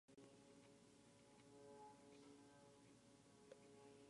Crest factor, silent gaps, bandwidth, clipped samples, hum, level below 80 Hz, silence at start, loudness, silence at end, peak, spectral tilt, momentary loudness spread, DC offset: 18 dB; none; 11 kHz; under 0.1%; none; under -90 dBFS; 0.1 s; -67 LUFS; 0 s; -48 dBFS; -4.5 dB/octave; 5 LU; under 0.1%